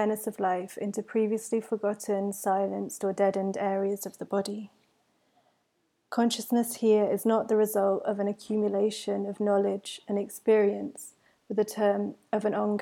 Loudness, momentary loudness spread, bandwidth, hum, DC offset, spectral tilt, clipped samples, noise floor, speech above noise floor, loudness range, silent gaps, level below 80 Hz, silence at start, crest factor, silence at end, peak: -28 LUFS; 9 LU; 17.5 kHz; none; under 0.1%; -5 dB/octave; under 0.1%; -75 dBFS; 47 dB; 5 LU; none; -82 dBFS; 0 s; 16 dB; 0 s; -12 dBFS